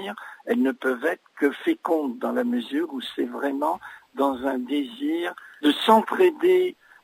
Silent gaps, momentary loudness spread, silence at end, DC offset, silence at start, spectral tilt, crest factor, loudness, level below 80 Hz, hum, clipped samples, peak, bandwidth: none; 10 LU; 0.3 s; under 0.1%; 0 s; -4.5 dB/octave; 20 dB; -24 LUFS; -70 dBFS; none; under 0.1%; -4 dBFS; 16 kHz